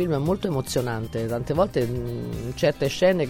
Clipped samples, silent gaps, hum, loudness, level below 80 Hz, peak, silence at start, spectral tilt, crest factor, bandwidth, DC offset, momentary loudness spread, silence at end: under 0.1%; none; none; -25 LUFS; -44 dBFS; -8 dBFS; 0 s; -6 dB/octave; 16 dB; 16.5 kHz; under 0.1%; 8 LU; 0 s